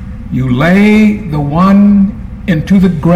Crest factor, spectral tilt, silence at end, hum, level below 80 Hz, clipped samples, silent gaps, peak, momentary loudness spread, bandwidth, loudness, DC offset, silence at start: 8 dB; -8.5 dB/octave; 0 s; none; -28 dBFS; under 0.1%; none; 0 dBFS; 9 LU; 8.4 kHz; -9 LUFS; under 0.1%; 0 s